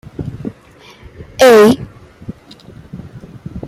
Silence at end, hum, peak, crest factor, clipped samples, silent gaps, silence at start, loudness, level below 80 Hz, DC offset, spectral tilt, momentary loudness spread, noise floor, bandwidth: 0 s; none; 0 dBFS; 14 dB; under 0.1%; none; 0.2 s; -9 LUFS; -42 dBFS; under 0.1%; -5 dB/octave; 27 LU; -42 dBFS; 16 kHz